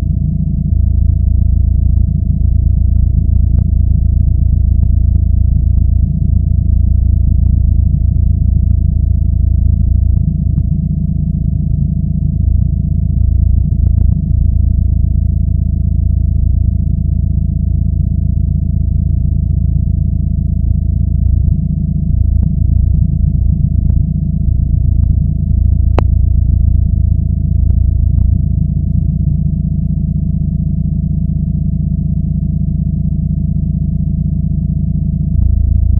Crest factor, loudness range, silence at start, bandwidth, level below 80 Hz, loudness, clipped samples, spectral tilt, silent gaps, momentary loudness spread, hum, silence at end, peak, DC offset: 12 dB; 3 LU; 0 s; 1.4 kHz; -14 dBFS; -14 LUFS; under 0.1%; -13 dB/octave; none; 3 LU; none; 0 s; 0 dBFS; under 0.1%